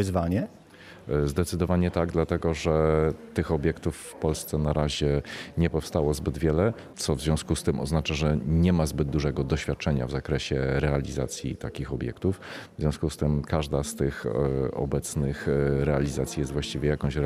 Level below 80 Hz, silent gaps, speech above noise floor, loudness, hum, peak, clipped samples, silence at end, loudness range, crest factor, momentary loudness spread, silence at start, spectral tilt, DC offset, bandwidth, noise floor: -38 dBFS; none; 21 dB; -27 LUFS; none; -8 dBFS; under 0.1%; 0 s; 3 LU; 18 dB; 7 LU; 0 s; -6 dB/octave; under 0.1%; 15 kHz; -48 dBFS